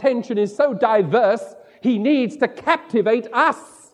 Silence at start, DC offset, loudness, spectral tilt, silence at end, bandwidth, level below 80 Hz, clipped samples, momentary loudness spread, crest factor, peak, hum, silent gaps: 0 s; under 0.1%; -19 LUFS; -6 dB/octave; 0.3 s; 11 kHz; -72 dBFS; under 0.1%; 7 LU; 18 dB; -2 dBFS; none; none